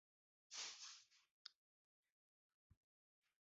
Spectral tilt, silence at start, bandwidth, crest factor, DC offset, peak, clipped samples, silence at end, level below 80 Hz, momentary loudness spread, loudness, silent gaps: 2.5 dB/octave; 0.5 s; 7.6 kHz; 24 dB; under 0.1%; -38 dBFS; under 0.1%; 0.7 s; under -90 dBFS; 12 LU; -56 LUFS; 1.31-1.45 s, 1.55-2.03 s, 2.12-2.70 s